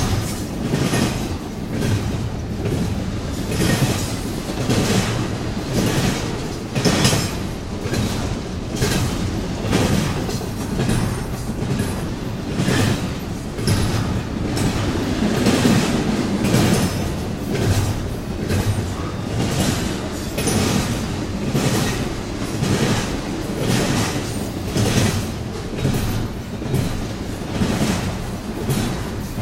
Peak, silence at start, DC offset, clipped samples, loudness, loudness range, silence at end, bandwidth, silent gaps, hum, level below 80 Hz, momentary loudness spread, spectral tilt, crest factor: 0 dBFS; 0 s; under 0.1%; under 0.1%; -21 LUFS; 3 LU; 0 s; 16 kHz; none; none; -32 dBFS; 8 LU; -5 dB/octave; 20 dB